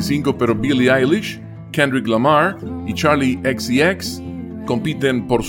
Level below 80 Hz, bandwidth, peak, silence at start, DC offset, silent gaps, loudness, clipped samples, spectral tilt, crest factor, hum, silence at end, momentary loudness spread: -44 dBFS; 17 kHz; -2 dBFS; 0 s; under 0.1%; none; -17 LUFS; under 0.1%; -5.5 dB/octave; 16 dB; none; 0 s; 13 LU